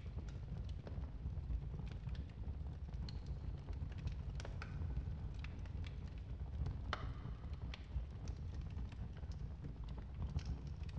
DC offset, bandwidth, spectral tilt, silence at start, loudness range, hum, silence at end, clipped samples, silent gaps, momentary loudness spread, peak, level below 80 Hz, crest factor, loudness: under 0.1%; 7.6 kHz; -7 dB/octave; 0 s; 1 LU; none; 0 s; under 0.1%; none; 4 LU; -24 dBFS; -48 dBFS; 22 dB; -48 LUFS